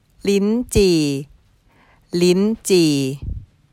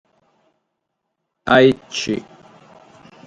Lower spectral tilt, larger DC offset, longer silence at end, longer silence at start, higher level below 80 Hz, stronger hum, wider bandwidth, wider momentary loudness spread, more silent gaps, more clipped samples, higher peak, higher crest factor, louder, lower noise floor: about the same, -5.5 dB/octave vs -5 dB/octave; neither; second, 0.3 s vs 1.05 s; second, 0.25 s vs 1.45 s; first, -36 dBFS vs -56 dBFS; neither; first, 16.5 kHz vs 8.8 kHz; about the same, 13 LU vs 14 LU; neither; neither; second, -4 dBFS vs 0 dBFS; second, 16 dB vs 22 dB; about the same, -18 LUFS vs -17 LUFS; second, -55 dBFS vs -76 dBFS